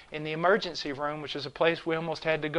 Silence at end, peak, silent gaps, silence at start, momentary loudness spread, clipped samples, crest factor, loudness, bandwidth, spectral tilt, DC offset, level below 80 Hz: 0 s; -8 dBFS; none; 0 s; 9 LU; under 0.1%; 22 dB; -29 LUFS; 10.5 kHz; -5.5 dB/octave; under 0.1%; -62 dBFS